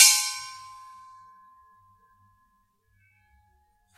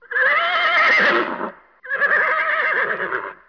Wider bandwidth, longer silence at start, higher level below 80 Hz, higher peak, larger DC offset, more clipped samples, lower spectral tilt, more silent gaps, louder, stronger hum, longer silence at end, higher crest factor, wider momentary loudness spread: first, 16 kHz vs 5.4 kHz; about the same, 0 s vs 0.1 s; second, -72 dBFS vs -62 dBFS; first, 0 dBFS vs -6 dBFS; neither; neither; second, 6 dB/octave vs -3.5 dB/octave; neither; second, -21 LUFS vs -17 LUFS; neither; first, 3.4 s vs 0.15 s; first, 28 dB vs 12 dB; first, 29 LU vs 12 LU